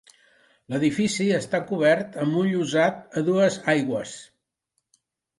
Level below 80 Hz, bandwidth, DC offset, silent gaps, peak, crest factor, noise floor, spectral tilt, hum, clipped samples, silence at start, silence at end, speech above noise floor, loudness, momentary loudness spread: -66 dBFS; 11.5 kHz; under 0.1%; none; -8 dBFS; 16 dB; -78 dBFS; -5.5 dB/octave; none; under 0.1%; 0.7 s; 1.15 s; 55 dB; -23 LUFS; 8 LU